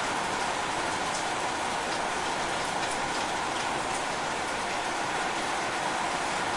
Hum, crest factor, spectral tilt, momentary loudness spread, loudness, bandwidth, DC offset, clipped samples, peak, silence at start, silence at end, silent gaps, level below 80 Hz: none; 14 dB; -2 dB/octave; 1 LU; -29 LUFS; 11.5 kHz; under 0.1%; under 0.1%; -16 dBFS; 0 s; 0 s; none; -56 dBFS